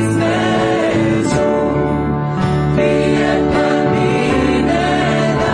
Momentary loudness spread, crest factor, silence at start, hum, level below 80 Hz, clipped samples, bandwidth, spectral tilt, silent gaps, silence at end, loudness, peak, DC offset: 3 LU; 12 dB; 0 s; none; -32 dBFS; under 0.1%; 10.5 kHz; -6.5 dB/octave; none; 0 s; -15 LUFS; -2 dBFS; under 0.1%